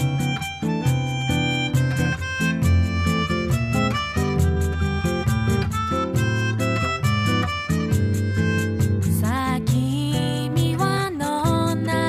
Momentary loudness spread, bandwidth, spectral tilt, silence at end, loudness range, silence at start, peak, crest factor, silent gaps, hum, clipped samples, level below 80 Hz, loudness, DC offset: 2 LU; 15.5 kHz; -6 dB/octave; 0 s; 1 LU; 0 s; -6 dBFS; 14 dB; none; none; under 0.1%; -36 dBFS; -22 LUFS; under 0.1%